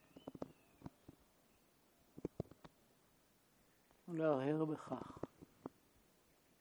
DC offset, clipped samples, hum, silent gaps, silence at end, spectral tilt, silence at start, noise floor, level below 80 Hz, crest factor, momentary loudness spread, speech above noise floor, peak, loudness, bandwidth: under 0.1%; under 0.1%; none; none; 0.9 s; -8 dB/octave; 0.15 s; -74 dBFS; -76 dBFS; 22 dB; 22 LU; 34 dB; -26 dBFS; -44 LUFS; over 20 kHz